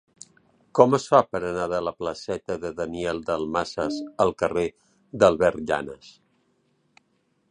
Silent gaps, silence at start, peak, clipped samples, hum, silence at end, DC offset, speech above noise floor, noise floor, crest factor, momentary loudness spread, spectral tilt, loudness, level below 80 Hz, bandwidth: none; 0.75 s; -2 dBFS; under 0.1%; none; 1.4 s; under 0.1%; 45 dB; -69 dBFS; 24 dB; 12 LU; -5.5 dB/octave; -24 LUFS; -54 dBFS; 10.5 kHz